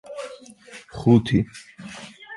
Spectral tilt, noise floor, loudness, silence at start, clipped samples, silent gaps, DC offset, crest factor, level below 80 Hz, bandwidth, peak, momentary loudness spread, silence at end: -7.5 dB/octave; -45 dBFS; -20 LUFS; 0.1 s; under 0.1%; none; under 0.1%; 20 dB; -48 dBFS; 11.5 kHz; -4 dBFS; 25 LU; 0 s